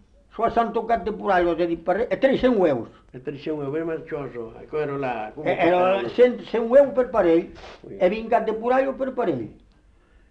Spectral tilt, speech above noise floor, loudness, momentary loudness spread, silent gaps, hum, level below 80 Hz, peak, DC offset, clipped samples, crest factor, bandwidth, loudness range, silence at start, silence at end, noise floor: -7.5 dB/octave; 34 dB; -22 LUFS; 15 LU; none; none; -50 dBFS; -6 dBFS; under 0.1%; under 0.1%; 16 dB; 7.8 kHz; 5 LU; 0.35 s; 0.75 s; -56 dBFS